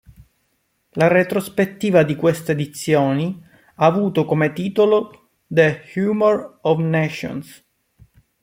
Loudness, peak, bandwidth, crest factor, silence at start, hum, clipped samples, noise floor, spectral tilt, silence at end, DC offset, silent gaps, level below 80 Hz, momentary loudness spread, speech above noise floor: -19 LUFS; -2 dBFS; 16.5 kHz; 18 dB; 0.95 s; none; under 0.1%; -68 dBFS; -6.5 dB/octave; 0.9 s; under 0.1%; none; -58 dBFS; 9 LU; 50 dB